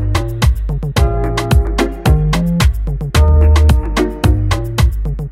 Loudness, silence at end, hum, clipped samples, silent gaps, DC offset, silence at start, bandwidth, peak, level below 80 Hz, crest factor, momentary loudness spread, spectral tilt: -14 LUFS; 0 s; none; under 0.1%; none; under 0.1%; 0 s; 15 kHz; -2 dBFS; -14 dBFS; 12 dB; 7 LU; -6 dB/octave